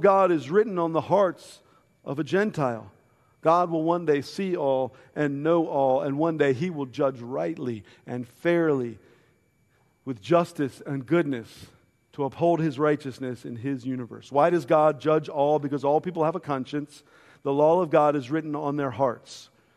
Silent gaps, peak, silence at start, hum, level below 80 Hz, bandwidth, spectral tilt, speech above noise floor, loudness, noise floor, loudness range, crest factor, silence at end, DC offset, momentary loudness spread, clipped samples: none; -6 dBFS; 0 s; none; -70 dBFS; 13 kHz; -7.5 dB/octave; 41 dB; -25 LUFS; -65 dBFS; 4 LU; 18 dB; 0.3 s; under 0.1%; 14 LU; under 0.1%